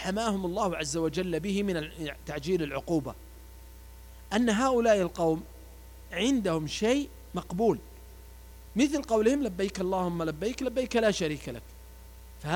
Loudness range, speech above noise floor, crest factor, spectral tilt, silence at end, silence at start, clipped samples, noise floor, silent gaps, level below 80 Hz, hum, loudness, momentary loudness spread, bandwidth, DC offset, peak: 4 LU; 20 dB; 18 dB; -5 dB/octave; 0 s; 0 s; under 0.1%; -48 dBFS; none; -48 dBFS; none; -29 LUFS; 23 LU; 19.5 kHz; under 0.1%; -12 dBFS